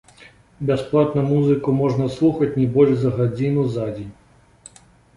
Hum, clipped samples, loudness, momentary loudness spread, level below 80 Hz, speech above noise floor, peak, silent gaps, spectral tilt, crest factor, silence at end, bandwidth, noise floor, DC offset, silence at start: none; under 0.1%; -19 LUFS; 10 LU; -50 dBFS; 30 dB; -4 dBFS; none; -9 dB/octave; 16 dB; 1.05 s; 11 kHz; -48 dBFS; under 0.1%; 0.6 s